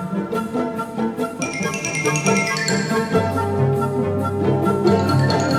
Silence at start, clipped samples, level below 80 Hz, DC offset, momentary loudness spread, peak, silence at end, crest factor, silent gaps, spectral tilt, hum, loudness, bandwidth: 0 s; under 0.1%; -54 dBFS; under 0.1%; 7 LU; -4 dBFS; 0 s; 16 dB; none; -5.5 dB/octave; none; -20 LUFS; 15.5 kHz